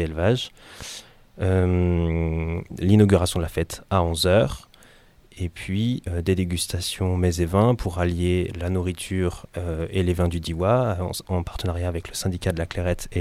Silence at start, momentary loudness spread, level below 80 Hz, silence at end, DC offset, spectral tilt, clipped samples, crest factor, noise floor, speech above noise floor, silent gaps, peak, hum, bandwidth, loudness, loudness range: 0 s; 10 LU; -38 dBFS; 0 s; under 0.1%; -6 dB/octave; under 0.1%; 20 dB; -52 dBFS; 29 dB; none; -4 dBFS; none; 15.5 kHz; -24 LUFS; 3 LU